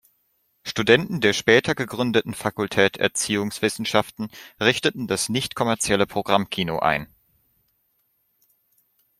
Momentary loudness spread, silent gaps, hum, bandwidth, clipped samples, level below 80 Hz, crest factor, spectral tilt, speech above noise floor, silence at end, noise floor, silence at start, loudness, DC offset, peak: 9 LU; none; none; 16 kHz; under 0.1%; -56 dBFS; 24 dB; -3.5 dB/octave; 47 dB; 2.15 s; -69 dBFS; 0.65 s; -22 LUFS; under 0.1%; 0 dBFS